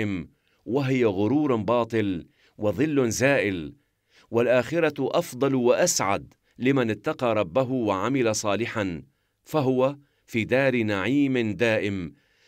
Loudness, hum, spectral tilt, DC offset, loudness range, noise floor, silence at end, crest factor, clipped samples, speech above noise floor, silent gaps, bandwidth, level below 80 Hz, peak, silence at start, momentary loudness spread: -24 LUFS; none; -5 dB/octave; under 0.1%; 2 LU; -61 dBFS; 0.35 s; 18 dB; under 0.1%; 38 dB; none; 16 kHz; -60 dBFS; -8 dBFS; 0 s; 9 LU